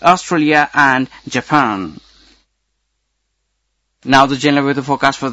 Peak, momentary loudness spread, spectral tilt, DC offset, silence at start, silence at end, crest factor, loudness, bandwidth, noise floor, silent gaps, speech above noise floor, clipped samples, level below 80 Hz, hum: 0 dBFS; 11 LU; -4.5 dB/octave; under 0.1%; 0 s; 0 s; 16 dB; -14 LUFS; 9.4 kHz; -69 dBFS; none; 56 dB; 0.2%; -50 dBFS; none